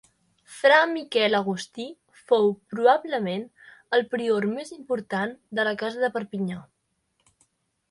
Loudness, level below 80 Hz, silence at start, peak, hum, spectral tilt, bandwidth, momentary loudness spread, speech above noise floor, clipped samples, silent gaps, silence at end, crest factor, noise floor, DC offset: -24 LUFS; -72 dBFS; 0.5 s; -4 dBFS; none; -5 dB/octave; 11.5 kHz; 14 LU; 49 dB; under 0.1%; none; 1.3 s; 22 dB; -73 dBFS; under 0.1%